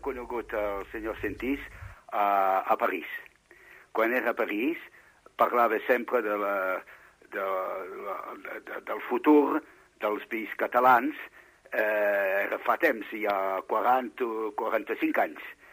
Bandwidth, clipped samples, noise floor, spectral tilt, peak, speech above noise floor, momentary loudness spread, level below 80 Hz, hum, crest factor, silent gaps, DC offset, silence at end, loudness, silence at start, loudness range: 15.5 kHz; under 0.1%; -55 dBFS; -5.5 dB/octave; -10 dBFS; 27 dB; 14 LU; -60 dBFS; 50 Hz at -75 dBFS; 20 dB; none; under 0.1%; 0.2 s; -28 LUFS; 0.05 s; 3 LU